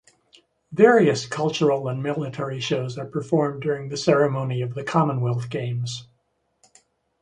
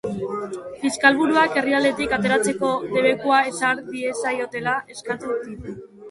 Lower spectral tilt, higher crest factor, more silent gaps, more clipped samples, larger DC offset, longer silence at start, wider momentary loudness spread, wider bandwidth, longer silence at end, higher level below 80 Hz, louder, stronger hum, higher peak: first, -6 dB/octave vs -4 dB/octave; about the same, 20 dB vs 22 dB; neither; neither; neither; first, 0.7 s vs 0.05 s; about the same, 11 LU vs 12 LU; second, 10 kHz vs 11.5 kHz; first, 1.15 s vs 0 s; second, -62 dBFS vs -54 dBFS; about the same, -23 LUFS vs -21 LUFS; neither; second, -4 dBFS vs 0 dBFS